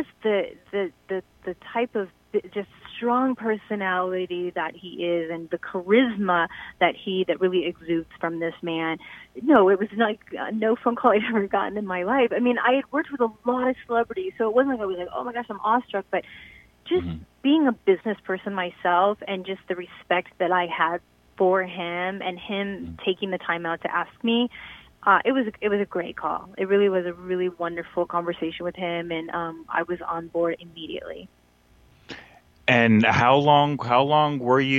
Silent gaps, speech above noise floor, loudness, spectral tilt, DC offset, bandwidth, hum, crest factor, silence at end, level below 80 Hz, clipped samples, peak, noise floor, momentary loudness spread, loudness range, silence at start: none; 34 dB; -24 LUFS; -7 dB/octave; under 0.1%; 7.4 kHz; none; 20 dB; 0 s; -60 dBFS; under 0.1%; -4 dBFS; -58 dBFS; 12 LU; 6 LU; 0 s